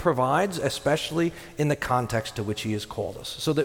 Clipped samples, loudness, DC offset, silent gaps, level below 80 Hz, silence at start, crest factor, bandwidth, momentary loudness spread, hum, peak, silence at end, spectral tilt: under 0.1%; -27 LUFS; under 0.1%; none; -50 dBFS; 0 s; 16 dB; 17.5 kHz; 7 LU; none; -8 dBFS; 0 s; -5 dB/octave